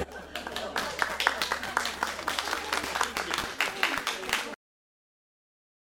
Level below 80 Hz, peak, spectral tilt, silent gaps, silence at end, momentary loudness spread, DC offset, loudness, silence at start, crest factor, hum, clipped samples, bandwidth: -56 dBFS; -4 dBFS; -1 dB/octave; none; 1.4 s; 9 LU; under 0.1%; -30 LUFS; 0 s; 28 dB; none; under 0.1%; over 20 kHz